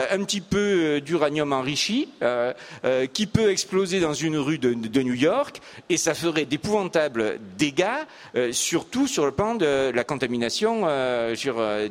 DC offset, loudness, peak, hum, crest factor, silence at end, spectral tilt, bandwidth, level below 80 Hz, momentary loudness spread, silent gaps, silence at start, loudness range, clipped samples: under 0.1%; -24 LUFS; -6 dBFS; none; 18 dB; 0 s; -4 dB/octave; 16 kHz; -54 dBFS; 5 LU; none; 0 s; 1 LU; under 0.1%